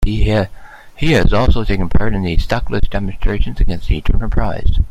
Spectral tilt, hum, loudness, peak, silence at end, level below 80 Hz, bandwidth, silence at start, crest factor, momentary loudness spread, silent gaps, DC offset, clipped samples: -7 dB/octave; none; -18 LUFS; 0 dBFS; 0 s; -16 dBFS; 8 kHz; 0 s; 12 dB; 7 LU; none; under 0.1%; under 0.1%